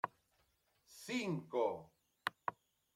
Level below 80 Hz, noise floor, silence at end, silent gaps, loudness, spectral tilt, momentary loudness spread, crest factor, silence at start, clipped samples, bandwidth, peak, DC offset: -84 dBFS; -78 dBFS; 0.45 s; none; -42 LUFS; -5 dB/octave; 13 LU; 24 dB; 0.05 s; under 0.1%; 16.5 kHz; -20 dBFS; under 0.1%